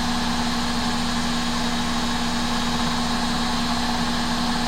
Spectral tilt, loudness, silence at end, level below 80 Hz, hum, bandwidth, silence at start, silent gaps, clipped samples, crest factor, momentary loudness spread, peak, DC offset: -3.5 dB/octave; -23 LUFS; 0 s; -32 dBFS; 50 Hz at -40 dBFS; 16 kHz; 0 s; none; under 0.1%; 14 dB; 1 LU; -10 dBFS; under 0.1%